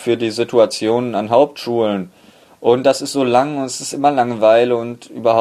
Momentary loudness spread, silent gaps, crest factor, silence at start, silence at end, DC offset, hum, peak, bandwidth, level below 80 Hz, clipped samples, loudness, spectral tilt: 8 LU; none; 16 dB; 0 s; 0 s; under 0.1%; none; 0 dBFS; 14 kHz; -60 dBFS; under 0.1%; -16 LUFS; -5 dB/octave